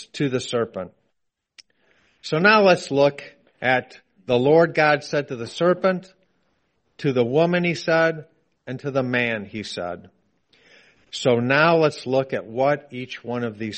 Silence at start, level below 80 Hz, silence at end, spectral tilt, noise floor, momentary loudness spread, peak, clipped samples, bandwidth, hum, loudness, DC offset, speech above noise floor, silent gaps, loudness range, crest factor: 0 s; -64 dBFS; 0 s; -5.5 dB/octave; -76 dBFS; 16 LU; -2 dBFS; under 0.1%; 8.8 kHz; none; -21 LUFS; under 0.1%; 55 dB; none; 5 LU; 20 dB